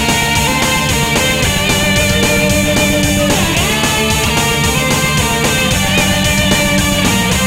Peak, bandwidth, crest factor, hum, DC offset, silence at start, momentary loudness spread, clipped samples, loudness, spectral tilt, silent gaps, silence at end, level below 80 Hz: 0 dBFS; 16.5 kHz; 12 dB; none; 0.2%; 0 s; 1 LU; under 0.1%; -11 LUFS; -3.5 dB/octave; none; 0 s; -24 dBFS